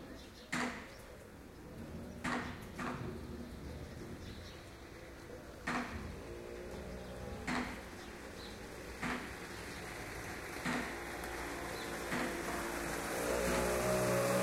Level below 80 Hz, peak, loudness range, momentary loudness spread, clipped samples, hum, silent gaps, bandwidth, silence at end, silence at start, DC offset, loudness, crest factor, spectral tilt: -54 dBFS; -22 dBFS; 8 LU; 17 LU; under 0.1%; none; none; 16 kHz; 0 s; 0 s; under 0.1%; -41 LUFS; 18 dB; -4 dB/octave